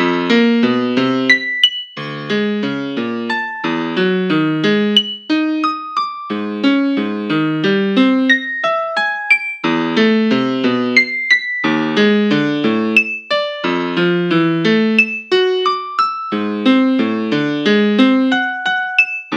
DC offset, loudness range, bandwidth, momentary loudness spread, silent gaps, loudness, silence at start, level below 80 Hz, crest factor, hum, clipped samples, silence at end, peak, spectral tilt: under 0.1%; 2 LU; 9.2 kHz; 7 LU; none; -15 LUFS; 0 s; -70 dBFS; 16 dB; none; under 0.1%; 0 s; 0 dBFS; -5.5 dB/octave